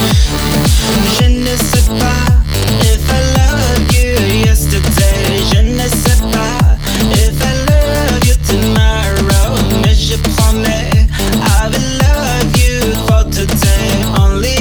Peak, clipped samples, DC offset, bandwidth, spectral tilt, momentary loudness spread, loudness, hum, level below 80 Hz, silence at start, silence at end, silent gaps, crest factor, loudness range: 0 dBFS; under 0.1%; under 0.1%; over 20 kHz; -4.5 dB/octave; 2 LU; -11 LUFS; none; -14 dBFS; 0 s; 0 s; none; 10 dB; 1 LU